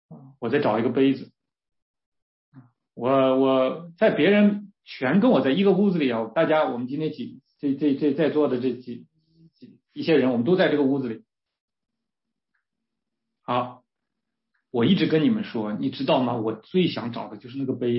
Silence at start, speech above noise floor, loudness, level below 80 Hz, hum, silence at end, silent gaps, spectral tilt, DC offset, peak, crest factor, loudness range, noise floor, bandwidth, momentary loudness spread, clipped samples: 0.1 s; 63 dB; -23 LUFS; -70 dBFS; none; 0 s; 1.82-1.94 s, 2.06-2.12 s, 2.22-2.52 s, 11.61-11.68 s; -11 dB/octave; under 0.1%; -8 dBFS; 16 dB; 7 LU; -85 dBFS; 5.8 kHz; 14 LU; under 0.1%